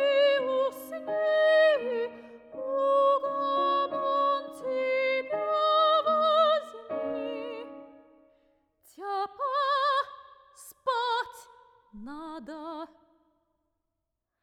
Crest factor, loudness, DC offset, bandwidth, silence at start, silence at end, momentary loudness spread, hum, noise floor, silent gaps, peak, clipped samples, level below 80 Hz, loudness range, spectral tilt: 16 dB; -27 LUFS; under 0.1%; 13.5 kHz; 0 s; 1.55 s; 18 LU; none; -84 dBFS; none; -12 dBFS; under 0.1%; -72 dBFS; 10 LU; -3 dB/octave